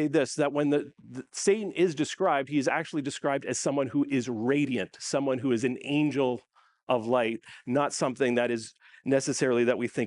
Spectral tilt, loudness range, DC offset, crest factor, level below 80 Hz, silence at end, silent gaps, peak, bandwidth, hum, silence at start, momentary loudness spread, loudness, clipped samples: -5 dB/octave; 1 LU; under 0.1%; 16 dB; -74 dBFS; 0 s; 6.83-6.87 s; -12 dBFS; 11.5 kHz; none; 0 s; 6 LU; -28 LUFS; under 0.1%